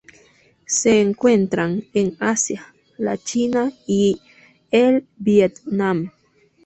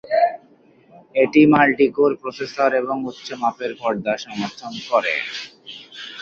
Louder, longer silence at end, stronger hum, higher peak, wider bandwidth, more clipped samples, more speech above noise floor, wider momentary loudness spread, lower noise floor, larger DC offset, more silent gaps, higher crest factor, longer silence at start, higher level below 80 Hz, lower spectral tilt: about the same, -19 LUFS vs -19 LUFS; first, 0.55 s vs 0 s; neither; about the same, -2 dBFS vs -2 dBFS; first, 8.4 kHz vs 7.2 kHz; neither; first, 39 dB vs 33 dB; second, 9 LU vs 19 LU; first, -58 dBFS vs -52 dBFS; neither; neither; about the same, 18 dB vs 18 dB; first, 0.7 s vs 0.05 s; about the same, -58 dBFS vs -62 dBFS; about the same, -4.5 dB/octave vs -5.5 dB/octave